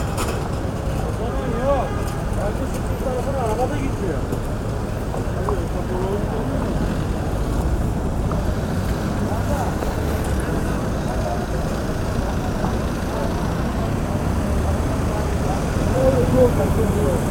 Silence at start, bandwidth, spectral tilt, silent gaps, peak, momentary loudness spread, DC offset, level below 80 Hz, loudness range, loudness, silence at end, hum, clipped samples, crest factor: 0 s; 18 kHz; -7 dB/octave; none; -4 dBFS; 5 LU; under 0.1%; -26 dBFS; 4 LU; -22 LUFS; 0 s; none; under 0.1%; 18 dB